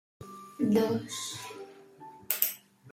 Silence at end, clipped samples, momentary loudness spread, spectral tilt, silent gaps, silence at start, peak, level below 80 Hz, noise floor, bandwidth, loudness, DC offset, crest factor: 0 s; under 0.1%; 23 LU; -4.5 dB/octave; none; 0.2 s; -4 dBFS; -72 dBFS; -51 dBFS; 16.5 kHz; -30 LUFS; under 0.1%; 30 dB